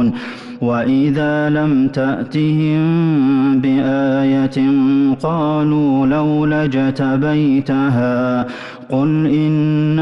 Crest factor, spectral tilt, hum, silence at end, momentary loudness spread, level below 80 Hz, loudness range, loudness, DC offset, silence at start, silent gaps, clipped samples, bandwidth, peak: 8 dB; -9 dB/octave; none; 0 s; 5 LU; -50 dBFS; 2 LU; -15 LUFS; under 0.1%; 0 s; none; under 0.1%; 6.2 kHz; -8 dBFS